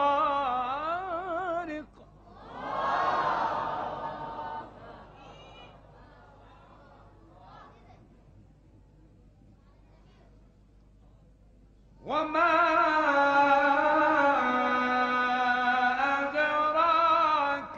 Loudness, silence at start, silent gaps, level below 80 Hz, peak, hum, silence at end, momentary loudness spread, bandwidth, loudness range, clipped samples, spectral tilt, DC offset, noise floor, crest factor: -26 LUFS; 0 s; none; -60 dBFS; -12 dBFS; 50 Hz at -60 dBFS; 0 s; 16 LU; 7.6 kHz; 16 LU; under 0.1%; -4.5 dB/octave; under 0.1%; -58 dBFS; 18 dB